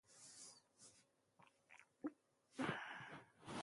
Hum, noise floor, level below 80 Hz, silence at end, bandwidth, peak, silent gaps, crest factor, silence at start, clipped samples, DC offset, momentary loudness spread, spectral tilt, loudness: none; -76 dBFS; -84 dBFS; 0 s; 11.5 kHz; -30 dBFS; none; 24 dB; 0.1 s; under 0.1%; under 0.1%; 20 LU; -4 dB/octave; -52 LUFS